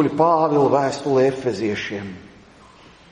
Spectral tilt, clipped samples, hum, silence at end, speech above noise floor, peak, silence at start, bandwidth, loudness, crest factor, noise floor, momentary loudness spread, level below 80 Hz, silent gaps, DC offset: -6.5 dB/octave; under 0.1%; none; 0.85 s; 28 dB; -4 dBFS; 0 s; 10 kHz; -19 LUFS; 18 dB; -47 dBFS; 14 LU; -58 dBFS; none; under 0.1%